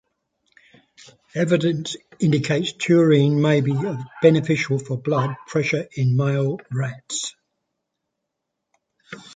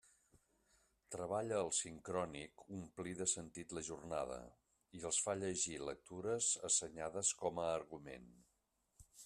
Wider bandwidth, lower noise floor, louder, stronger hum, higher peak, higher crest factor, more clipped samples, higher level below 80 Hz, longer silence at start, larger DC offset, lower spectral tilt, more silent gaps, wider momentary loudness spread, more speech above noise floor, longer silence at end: second, 9.4 kHz vs 13.5 kHz; about the same, -80 dBFS vs -83 dBFS; first, -21 LUFS vs -41 LUFS; neither; first, -2 dBFS vs -22 dBFS; about the same, 20 dB vs 22 dB; neither; first, -62 dBFS vs -72 dBFS; first, 1.35 s vs 1.1 s; neither; first, -6 dB/octave vs -2.5 dB/octave; neither; second, 11 LU vs 15 LU; first, 60 dB vs 40 dB; about the same, 0 s vs 0 s